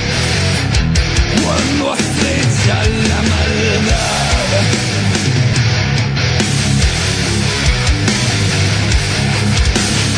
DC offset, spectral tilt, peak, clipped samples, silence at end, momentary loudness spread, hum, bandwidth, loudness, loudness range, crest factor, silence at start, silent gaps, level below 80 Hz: under 0.1%; -4 dB/octave; 0 dBFS; under 0.1%; 0 s; 1 LU; none; 10.5 kHz; -13 LUFS; 0 LU; 14 dB; 0 s; none; -22 dBFS